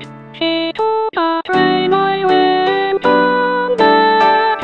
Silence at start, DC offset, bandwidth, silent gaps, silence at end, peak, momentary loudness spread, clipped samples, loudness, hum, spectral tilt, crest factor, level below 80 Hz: 0 s; 0.4%; 7.6 kHz; none; 0 s; 0 dBFS; 6 LU; under 0.1%; -13 LUFS; none; -6 dB/octave; 14 dB; -56 dBFS